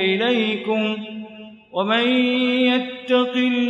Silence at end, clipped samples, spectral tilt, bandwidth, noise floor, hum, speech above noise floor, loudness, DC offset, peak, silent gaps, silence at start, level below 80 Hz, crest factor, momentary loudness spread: 0 s; under 0.1%; -6 dB/octave; 7.2 kHz; -40 dBFS; none; 21 dB; -20 LUFS; under 0.1%; -6 dBFS; none; 0 s; -72 dBFS; 14 dB; 12 LU